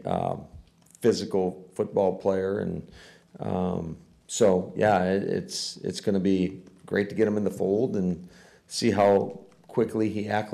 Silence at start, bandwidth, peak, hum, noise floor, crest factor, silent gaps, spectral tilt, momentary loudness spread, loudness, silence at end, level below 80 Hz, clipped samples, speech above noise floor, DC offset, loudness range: 0 s; 13.5 kHz; -12 dBFS; none; -51 dBFS; 16 dB; none; -5.5 dB/octave; 12 LU; -26 LUFS; 0 s; -60 dBFS; under 0.1%; 25 dB; under 0.1%; 3 LU